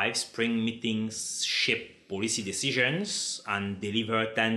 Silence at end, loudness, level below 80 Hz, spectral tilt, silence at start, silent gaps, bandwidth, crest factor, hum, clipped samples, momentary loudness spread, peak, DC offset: 0 s; -29 LUFS; -72 dBFS; -3 dB/octave; 0 s; none; 13 kHz; 18 dB; none; under 0.1%; 6 LU; -10 dBFS; under 0.1%